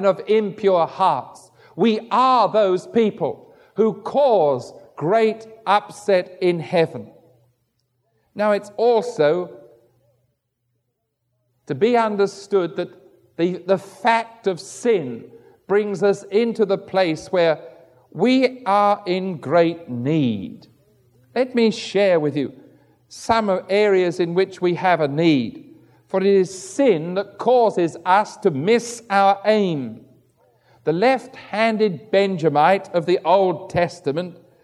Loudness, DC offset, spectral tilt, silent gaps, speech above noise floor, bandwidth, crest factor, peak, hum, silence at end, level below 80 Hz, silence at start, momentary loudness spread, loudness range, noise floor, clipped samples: -20 LUFS; under 0.1%; -6 dB/octave; none; 55 dB; 12 kHz; 18 dB; -2 dBFS; none; 0.3 s; -62 dBFS; 0 s; 10 LU; 4 LU; -74 dBFS; under 0.1%